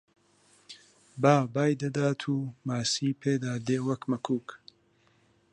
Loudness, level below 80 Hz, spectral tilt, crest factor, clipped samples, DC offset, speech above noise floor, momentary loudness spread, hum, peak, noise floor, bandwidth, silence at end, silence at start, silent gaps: -29 LUFS; -72 dBFS; -5.5 dB/octave; 24 dB; under 0.1%; under 0.1%; 38 dB; 25 LU; none; -6 dBFS; -66 dBFS; 11 kHz; 0.95 s; 0.7 s; none